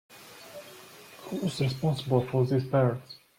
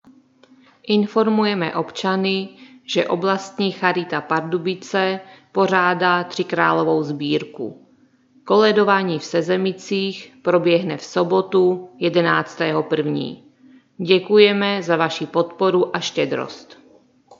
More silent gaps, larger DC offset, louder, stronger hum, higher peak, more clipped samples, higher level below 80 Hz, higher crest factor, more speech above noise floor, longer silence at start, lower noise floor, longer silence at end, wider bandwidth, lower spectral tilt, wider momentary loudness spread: neither; neither; second, -28 LUFS vs -19 LUFS; neither; second, -12 dBFS vs 0 dBFS; neither; first, -64 dBFS vs -74 dBFS; about the same, 18 dB vs 20 dB; second, 23 dB vs 37 dB; second, 0.1 s vs 0.85 s; second, -50 dBFS vs -56 dBFS; second, 0.2 s vs 0.65 s; first, 16 kHz vs 7.6 kHz; first, -7 dB/octave vs -5.5 dB/octave; first, 21 LU vs 10 LU